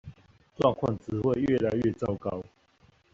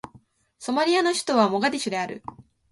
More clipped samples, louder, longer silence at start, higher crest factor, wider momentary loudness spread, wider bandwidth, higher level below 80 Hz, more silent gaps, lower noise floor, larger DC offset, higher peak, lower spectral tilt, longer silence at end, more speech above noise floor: neither; second, -28 LUFS vs -23 LUFS; second, 0.05 s vs 0.6 s; about the same, 20 dB vs 18 dB; second, 10 LU vs 16 LU; second, 7.6 kHz vs 11.5 kHz; first, -56 dBFS vs -66 dBFS; neither; first, -63 dBFS vs -56 dBFS; neither; second, -10 dBFS vs -6 dBFS; first, -7 dB/octave vs -3.5 dB/octave; first, 0.7 s vs 0.3 s; about the same, 36 dB vs 33 dB